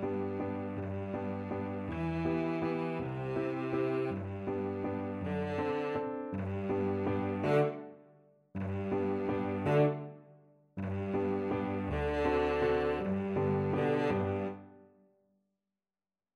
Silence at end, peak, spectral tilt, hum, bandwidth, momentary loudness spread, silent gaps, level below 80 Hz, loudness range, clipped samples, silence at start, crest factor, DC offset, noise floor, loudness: 1.5 s; -18 dBFS; -9 dB/octave; none; 10.5 kHz; 8 LU; none; -54 dBFS; 3 LU; under 0.1%; 0 s; 16 dB; under 0.1%; under -90 dBFS; -34 LUFS